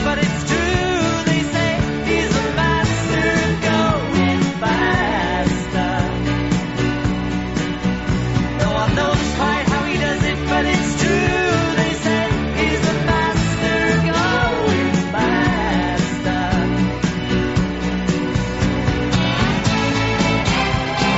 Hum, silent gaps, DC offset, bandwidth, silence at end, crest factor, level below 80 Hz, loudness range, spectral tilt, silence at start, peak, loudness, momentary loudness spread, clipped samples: none; none; 0.4%; 8 kHz; 0 s; 16 dB; -30 dBFS; 2 LU; -4.5 dB/octave; 0 s; -2 dBFS; -18 LUFS; 4 LU; under 0.1%